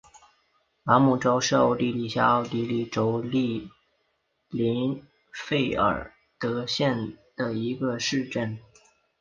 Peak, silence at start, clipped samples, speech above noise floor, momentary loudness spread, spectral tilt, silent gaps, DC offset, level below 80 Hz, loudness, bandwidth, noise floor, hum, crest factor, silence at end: -4 dBFS; 0.85 s; under 0.1%; 49 dB; 14 LU; -5.5 dB/octave; none; under 0.1%; -56 dBFS; -26 LUFS; 7.4 kHz; -73 dBFS; none; 22 dB; 0.6 s